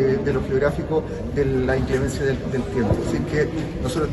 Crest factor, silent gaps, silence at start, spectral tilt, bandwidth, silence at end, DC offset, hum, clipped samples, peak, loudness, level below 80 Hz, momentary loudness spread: 14 dB; none; 0 s; -7 dB/octave; 12.5 kHz; 0 s; under 0.1%; none; under 0.1%; -8 dBFS; -23 LUFS; -34 dBFS; 4 LU